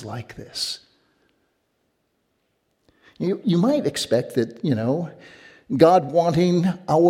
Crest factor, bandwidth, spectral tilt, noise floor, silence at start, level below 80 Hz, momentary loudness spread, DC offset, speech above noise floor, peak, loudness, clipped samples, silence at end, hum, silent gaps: 20 dB; 15.5 kHz; -6.5 dB/octave; -71 dBFS; 0 s; -60 dBFS; 17 LU; under 0.1%; 50 dB; -2 dBFS; -21 LUFS; under 0.1%; 0 s; none; none